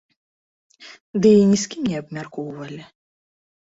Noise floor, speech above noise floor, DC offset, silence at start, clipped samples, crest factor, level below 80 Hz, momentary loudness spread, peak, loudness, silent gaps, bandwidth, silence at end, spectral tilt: under -90 dBFS; over 70 dB; under 0.1%; 0.8 s; under 0.1%; 18 dB; -60 dBFS; 20 LU; -4 dBFS; -18 LUFS; 1.00-1.13 s; 8 kHz; 0.95 s; -6 dB/octave